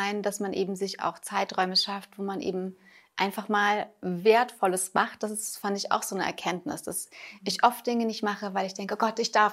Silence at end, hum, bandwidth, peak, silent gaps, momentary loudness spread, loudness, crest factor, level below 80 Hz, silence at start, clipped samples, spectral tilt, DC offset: 0 s; none; 16 kHz; -8 dBFS; none; 10 LU; -28 LUFS; 20 dB; -76 dBFS; 0 s; under 0.1%; -3 dB/octave; under 0.1%